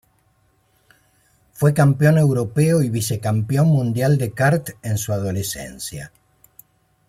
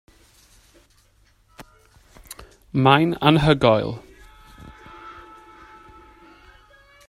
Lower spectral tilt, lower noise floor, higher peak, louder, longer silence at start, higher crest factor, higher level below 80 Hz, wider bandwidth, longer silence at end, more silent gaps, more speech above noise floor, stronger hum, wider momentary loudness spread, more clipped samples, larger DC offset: about the same, -6.5 dB/octave vs -6.5 dB/octave; about the same, -62 dBFS vs -59 dBFS; second, -4 dBFS vs 0 dBFS; about the same, -19 LUFS vs -18 LUFS; about the same, 1.6 s vs 1.6 s; second, 16 dB vs 24 dB; about the same, -52 dBFS vs -48 dBFS; first, 16 kHz vs 14.5 kHz; second, 1 s vs 1.95 s; neither; about the same, 43 dB vs 42 dB; neither; second, 14 LU vs 26 LU; neither; neither